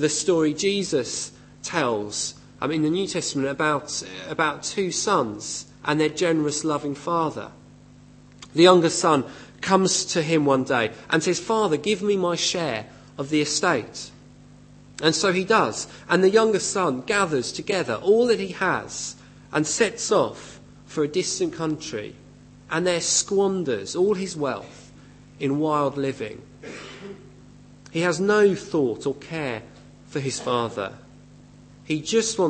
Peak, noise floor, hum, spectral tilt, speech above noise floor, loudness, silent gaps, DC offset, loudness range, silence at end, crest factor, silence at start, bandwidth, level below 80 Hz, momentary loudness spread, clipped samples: -2 dBFS; -49 dBFS; 50 Hz at -50 dBFS; -3.5 dB/octave; 26 dB; -23 LUFS; none; under 0.1%; 5 LU; 0 s; 22 dB; 0 s; 8.8 kHz; -58 dBFS; 14 LU; under 0.1%